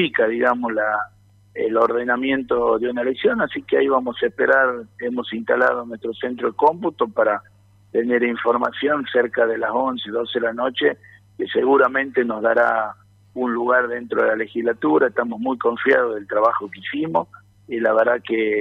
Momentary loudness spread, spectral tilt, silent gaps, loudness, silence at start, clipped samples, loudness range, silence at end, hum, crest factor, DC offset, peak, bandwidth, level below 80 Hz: 9 LU; -7 dB/octave; none; -20 LUFS; 0 s; under 0.1%; 2 LU; 0 s; none; 16 dB; under 0.1%; -4 dBFS; 5.4 kHz; -62 dBFS